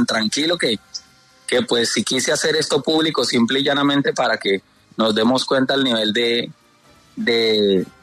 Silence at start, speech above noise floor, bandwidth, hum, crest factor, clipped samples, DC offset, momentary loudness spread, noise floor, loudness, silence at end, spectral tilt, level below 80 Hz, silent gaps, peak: 0 s; 34 dB; 13.5 kHz; none; 14 dB; under 0.1%; under 0.1%; 8 LU; -52 dBFS; -18 LUFS; 0.2 s; -3.5 dB/octave; -62 dBFS; none; -6 dBFS